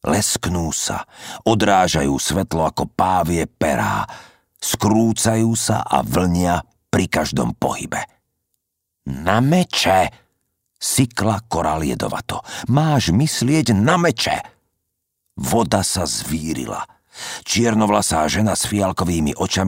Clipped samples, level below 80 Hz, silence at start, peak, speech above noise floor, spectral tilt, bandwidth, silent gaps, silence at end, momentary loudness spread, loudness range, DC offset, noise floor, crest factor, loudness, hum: under 0.1%; -40 dBFS; 0.05 s; -2 dBFS; 58 dB; -4.5 dB/octave; 16.5 kHz; none; 0 s; 11 LU; 3 LU; under 0.1%; -77 dBFS; 18 dB; -19 LUFS; none